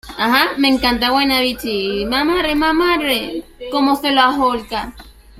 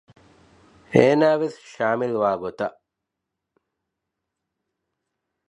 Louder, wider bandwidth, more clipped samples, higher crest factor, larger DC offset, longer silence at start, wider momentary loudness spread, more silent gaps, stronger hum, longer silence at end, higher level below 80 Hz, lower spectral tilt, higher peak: first, -16 LUFS vs -21 LUFS; first, 16 kHz vs 11 kHz; neither; second, 16 dB vs 24 dB; neither; second, 0.05 s vs 0.9 s; second, 10 LU vs 13 LU; neither; neither; second, 0 s vs 2.8 s; first, -38 dBFS vs -66 dBFS; second, -3.5 dB/octave vs -7 dB/octave; about the same, 0 dBFS vs 0 dBFS